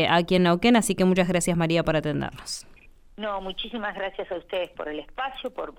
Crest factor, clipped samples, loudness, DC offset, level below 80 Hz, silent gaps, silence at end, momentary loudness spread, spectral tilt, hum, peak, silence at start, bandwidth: 18 dB; under 0.1%; -25 LUFS; under 0.1%; -48 dBFS; none; 0.05 s; 14 LU; -5 dB/octave; none; -6 dBFS; 0 s; 17 kHz